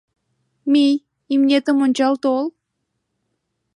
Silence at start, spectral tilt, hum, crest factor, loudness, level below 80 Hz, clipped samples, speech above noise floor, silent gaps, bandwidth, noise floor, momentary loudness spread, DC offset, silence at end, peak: 0.65 s; -4 dB/octave; none; 14 dB; -18 LUFS; -78 dBFS; under 0.1%; 59 dB; none; 11 kHz; -75 dBFS; 8 LU; under 0.1%; 1.25 s; -6 dBFS